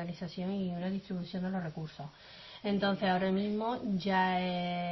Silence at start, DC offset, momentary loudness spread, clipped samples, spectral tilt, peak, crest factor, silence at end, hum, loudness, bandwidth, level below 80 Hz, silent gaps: 0 s; under 0.1%; 14 LU; under 0.1%; -5 dB/octave; -18 dBFS; 16 dB; 0 s; none; -34 LUFS; 6 kHz; -64 dBFS; none